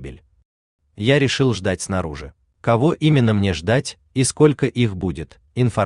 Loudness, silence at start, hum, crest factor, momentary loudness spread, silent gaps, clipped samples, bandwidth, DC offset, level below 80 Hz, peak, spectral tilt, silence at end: -19 LUFS; 0 s; none; 16 dB; 12 LU; 0.45-0.79 s; under 0.1%; 11 kHz; under 0.1%; -46 dBFS; -2 dBFS; -5.5 dB/octave; 0 s